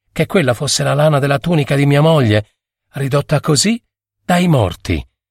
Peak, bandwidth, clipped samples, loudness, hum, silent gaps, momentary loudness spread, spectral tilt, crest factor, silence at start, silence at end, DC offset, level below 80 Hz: -2 dBFS; 16 kHz; under 0.1%; -14 LUFS; none; none; 11 LU; -5.5 dB/octave; 14 dB; 0.15 s; 0.25 s; under 0.1%; -38 dBFS